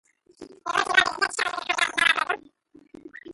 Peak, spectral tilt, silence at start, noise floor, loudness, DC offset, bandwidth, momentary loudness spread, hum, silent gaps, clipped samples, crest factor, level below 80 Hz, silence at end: -4 dBFS; 0 dB/octave; 0.4 s; -55 dBFS; -23 LUFS; under 0.1%; 12 kHz; 12 LU; none; none; under 0.1%; 24 dB; -64 dBFS; 0 s